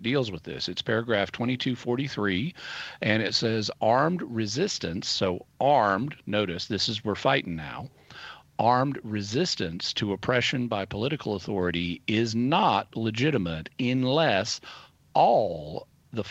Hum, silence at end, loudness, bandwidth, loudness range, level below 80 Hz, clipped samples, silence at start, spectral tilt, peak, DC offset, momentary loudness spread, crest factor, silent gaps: none; 0 s; -27 LUFS; 8.4 kHz; 2 LU; -58 dBFS; under 0.1%; 0 s; -5 dB/octave; -8 dBFS; under 0.1%; 12 LU; 20 dB; none